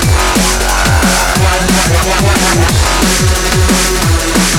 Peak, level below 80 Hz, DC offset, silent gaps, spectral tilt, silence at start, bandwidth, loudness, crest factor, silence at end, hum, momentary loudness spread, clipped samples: 0 dBFS; -16 dBFS; under 0.1%; none; -3.5 dB/octave; 0 s; 18.5 kHz; -10 LUFS; 10 dB; 0 s; none; 1 LU; under 0.1%